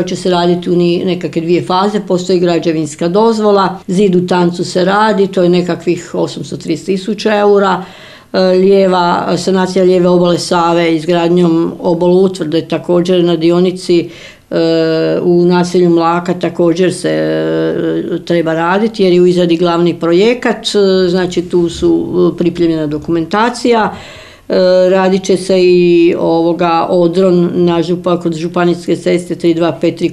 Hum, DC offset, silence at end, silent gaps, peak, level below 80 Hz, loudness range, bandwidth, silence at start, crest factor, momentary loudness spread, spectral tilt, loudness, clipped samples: none; under 0.1%; 0 s; none; 0 dBFS; -46 dBFS; 2 LU; 11.5 kHz; 0 s; 10 dB; 7 LU; -6.5 dB/octave; -11 LUFS; under 0.1%